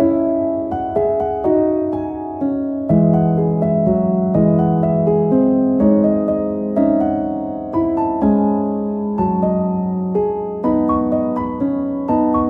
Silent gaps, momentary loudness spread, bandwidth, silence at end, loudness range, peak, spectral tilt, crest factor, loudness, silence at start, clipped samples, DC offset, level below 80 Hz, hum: none; 7 LU; 3.2 kHz; 0 s; 3 LU; -2 dBFS; -12.5 dB/octave; 14 dB; -17 LUFS; 0 s; under 0.1%; under 0.1%; -42 dBFS; none